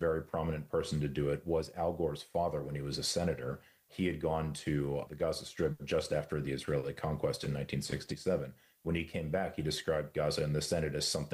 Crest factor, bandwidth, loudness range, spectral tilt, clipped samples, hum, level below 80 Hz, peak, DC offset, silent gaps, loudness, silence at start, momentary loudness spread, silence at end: 14 dB; 15.5 kHz; 1 LU; -5 dB/octave; under 0.1%; none; -54 dBFS; -22 dBFS; under 0.1%; none; -35 LUFS; 0 s; 4 LU; 0 s